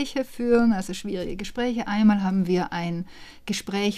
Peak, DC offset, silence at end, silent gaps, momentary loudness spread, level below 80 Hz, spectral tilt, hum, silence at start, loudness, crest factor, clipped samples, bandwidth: -8 dBFS; under 0.1%; 0 s; none; 11 LU; -46 dBFS; -6 dB/octave; none; 0 s; -25 LUFS; 16 dB; under 0.1%; 14.5 kHz